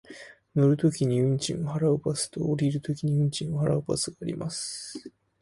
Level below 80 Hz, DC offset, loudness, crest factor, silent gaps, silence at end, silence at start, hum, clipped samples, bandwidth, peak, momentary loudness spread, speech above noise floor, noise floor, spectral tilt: -58 dBFS; under 0.1%; -27 LUFS; 14 dB; none; 0.35 s; 0.1 s; none; under 0.1%; 11.5 kHz; -12 dBFS; 10 LU; 21 dB; -48 dBFS; -6 dB/octave